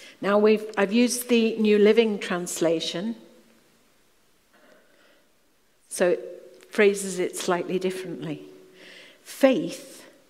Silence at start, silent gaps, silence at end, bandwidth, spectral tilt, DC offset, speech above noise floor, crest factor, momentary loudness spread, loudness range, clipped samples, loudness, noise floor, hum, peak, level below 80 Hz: 0 s; none; 0.3 s; 16 kHz; -4.5 dB/octave; under 0.1%; 43 dB; 22 dB; 19 LU; 11 LU; under 0.1%; -23 LUFS; -66 dBFS; none; -4 dBFS; -76 dBFS